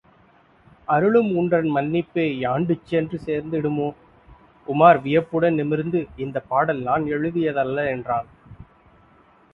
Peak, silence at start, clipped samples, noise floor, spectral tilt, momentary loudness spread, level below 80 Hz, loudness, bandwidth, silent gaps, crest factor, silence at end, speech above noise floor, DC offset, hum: 0 dBFS; 0.9 s; under 0.1%; -55 dBFS; -9.5 dB/octave; 10 LU; -54 dBFS; -21 LUFS; 5.4 kHz; none; 22 dB; 0.9 s; 35 dB; under 0.1%; none